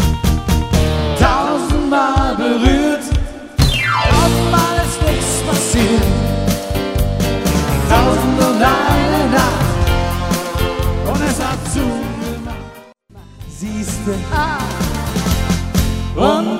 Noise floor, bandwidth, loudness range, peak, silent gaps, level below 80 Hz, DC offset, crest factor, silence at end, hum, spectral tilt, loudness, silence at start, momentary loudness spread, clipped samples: -40 dBFS; 16.5 kHz; 7 LU; 0 dBFS; none; -22 dBFS; under 0.1%; 14 dB; 0 s; none; -5 dB/octave; -16 LUFS; 0 s; 8 LU; under 0.1%